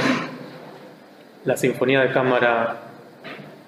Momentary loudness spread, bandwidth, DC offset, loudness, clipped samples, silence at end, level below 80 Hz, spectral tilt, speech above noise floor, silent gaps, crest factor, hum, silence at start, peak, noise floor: 22 LU; 15 kHz; under 0.1%; -20 LUFS; under 0.1%; 0.1 s; -72 dBFS; -5 dB/octave; 27 dB; none; 18 dB; none; 0 s; -4 dBFS; -46 dBFS